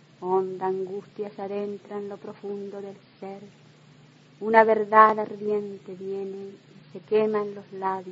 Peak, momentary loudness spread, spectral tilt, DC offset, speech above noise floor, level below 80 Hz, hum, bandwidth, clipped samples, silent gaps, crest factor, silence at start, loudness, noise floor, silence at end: -2 dBFS; 22 LU; -7.5 dB/octave; under 0.1%; 28 dB; -78 dBFS; none; 7.6 kHz; under 0.1%; none; 24 dB; 0.2 s; -25 LUFS; -53 dBFS; 0 s